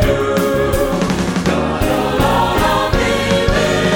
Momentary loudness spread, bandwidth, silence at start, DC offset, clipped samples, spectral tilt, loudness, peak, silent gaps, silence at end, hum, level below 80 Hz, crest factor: 3 LU; 19 kHz; 0 s; under 0.1%; under 0.1%; -5 dB/octave; -15 LUFS; 0 dBFS; none; 0 s; none; -26 dBFS; 14 dB